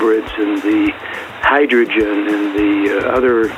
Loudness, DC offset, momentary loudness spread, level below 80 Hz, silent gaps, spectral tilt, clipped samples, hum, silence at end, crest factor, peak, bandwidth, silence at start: -15 LUFS; under 0.1%; 6 LU; -42 dBFS; none; -5.5 dB/octave; under 0.1%; none; 0 s; 14 dB; 0 dBFS; 12 kHz; 0 s